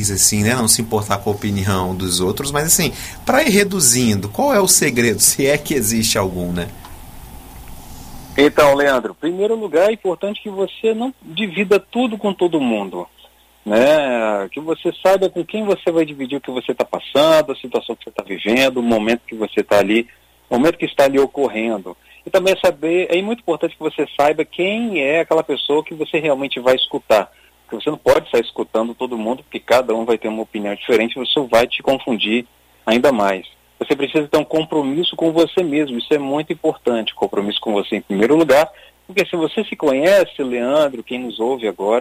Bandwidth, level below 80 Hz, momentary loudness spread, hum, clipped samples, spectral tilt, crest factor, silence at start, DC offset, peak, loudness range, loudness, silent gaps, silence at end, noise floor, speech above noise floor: 16 kHz; -46 dBFS; 11 LU; none; under 0.1%; -3.5 dB/octave; 16 dB; 0 s; under 0.1%; 0 dBFS; 4 LU; -17 LUFS; none; 0 s; -49 dBFS; 32 dB